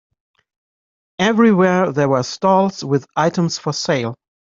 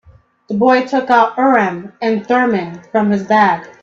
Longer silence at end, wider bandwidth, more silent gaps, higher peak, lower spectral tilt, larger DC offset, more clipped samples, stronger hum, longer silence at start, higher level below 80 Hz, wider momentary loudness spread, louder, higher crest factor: first, 0.4 s vs 0.15 s; about the same, 7.8 kHz vs 7.4 kHz; neither; about the same, -2 dBFS vs 0 dBFS; about the same, -5.5 dB/octave vs -6.5 dB/octave; neither; neither; neither; first, 1.2 s vs 0.5 s; about the same, -60 dBFS vs -58 dBFS; about the same, 8 LU vs 8 LU; second, -17 LUFS vs -14 LUFS; about the same, 16 dB vs 14 dB